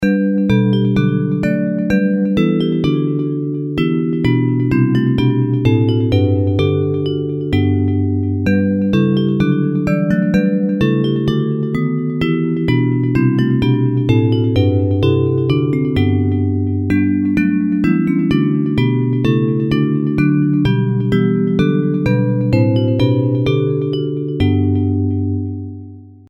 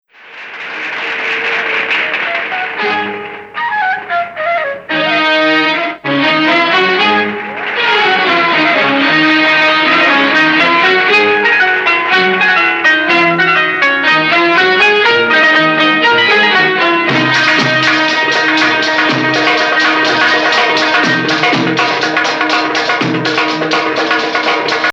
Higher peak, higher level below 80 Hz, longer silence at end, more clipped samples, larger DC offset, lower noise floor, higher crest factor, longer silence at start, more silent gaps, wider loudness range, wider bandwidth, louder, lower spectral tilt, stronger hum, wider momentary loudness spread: about the same, 0 dBFS vs 0 dBFS; first, -40 dBFS vs -60 dBFS; first, 0.15 s vs 0 s; neither; neither; about the same, -35 dBFS vs -32 dBFS; about the same, 14 dB vs 12 dB; second, 0 s vs 0.25 s; neither; second, 1 LU vs 6 LU; second, 7.4 kHz vs 9 kHz; second, -15 LUFS vs -10 LUFS; first, -9 dB/octave vs -3.5 dB/octave; neither; second, 4 LU vs 8 LU